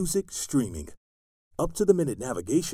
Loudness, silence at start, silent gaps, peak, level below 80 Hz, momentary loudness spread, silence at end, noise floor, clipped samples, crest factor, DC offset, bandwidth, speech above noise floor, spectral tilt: -27 LUFS; 0 s; 0.97-1.51 s; -6 dBFS; -46 dBFS; 17 LU; 0 s; under -90 dBFS; under 0.1%; 20 dB; under 0.1%; over 20 kHz; over 63 dB; -5.5 dB/octave